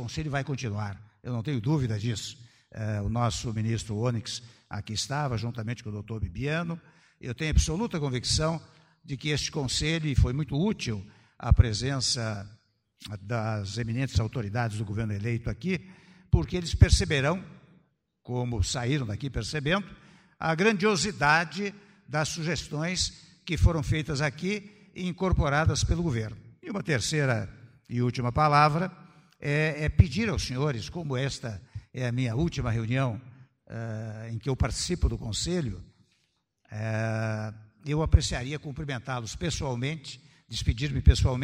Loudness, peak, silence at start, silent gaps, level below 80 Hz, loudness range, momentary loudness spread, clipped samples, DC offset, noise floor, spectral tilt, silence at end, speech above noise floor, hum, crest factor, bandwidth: -29 LUFS; -6 dBFS; 0 s; none; -36 dBFS; 5 LU; 14 LU; under 0.1%; under 0.1%; -74 dBFS; -5 dB/octave; 0 s; 46 dB; none; 22 dB; 13 kHz